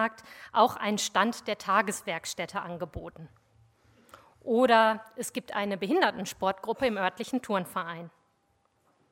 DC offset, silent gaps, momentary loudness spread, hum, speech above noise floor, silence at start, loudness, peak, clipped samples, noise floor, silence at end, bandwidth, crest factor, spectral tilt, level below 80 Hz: under 0.1%; none; 15 LU; none; 42 dB; 0 s; -29 LUFS; -8 dBFS; under 0.1%; -71 dBFS; 1.05 s; 16.5 kHz; 22 dB; -3.5 dB/octave; -62 dBFS